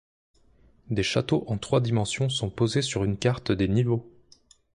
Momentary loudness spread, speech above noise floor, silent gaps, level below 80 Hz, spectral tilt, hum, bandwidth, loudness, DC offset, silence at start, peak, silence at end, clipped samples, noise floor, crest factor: 4 LU; 34 dB; none; -48 dBFS; -5.5 dB/octave; none; 11 kHz; -26 LUFS; under 0.1%; 0.9 s; -10 dBFS; 0.65 s; under 0.1%; -59 dBFS; 18 dB